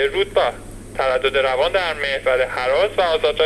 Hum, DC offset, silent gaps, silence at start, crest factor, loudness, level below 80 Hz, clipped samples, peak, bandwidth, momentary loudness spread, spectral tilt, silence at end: none; under 0.1%; none; 0 s; 14 dB; -19 LUFS; -40 dBFS; under 0.1%; -4 dBFS; 13 kHz; 5 LU; -3.5 dB/octave; 0 s